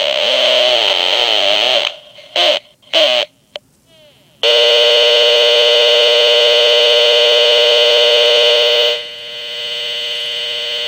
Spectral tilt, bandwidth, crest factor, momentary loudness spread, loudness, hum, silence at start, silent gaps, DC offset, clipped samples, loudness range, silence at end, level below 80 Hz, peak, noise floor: 1 dB/octave; 16.5 kHz; 12 dB; 11 LU; -10 LUFS; none; 0 s; none; under 0.1%; under 0.1%; 5 LU; 0 s; -64 dBFS; 0 dBFS; -48 dBFS